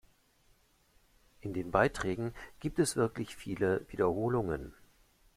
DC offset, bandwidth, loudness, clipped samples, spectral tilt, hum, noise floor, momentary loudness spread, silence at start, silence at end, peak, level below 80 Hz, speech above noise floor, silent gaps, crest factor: under 0.1%; 15.5 kHz; -33 LUFS; under 0.1%; -5.5 dB/octave; none; -68 dBFS; 11 LU; 1.45 s; 0.65 s; -12 dBFS; -56 dBFS; 35 dB; none; 24 dB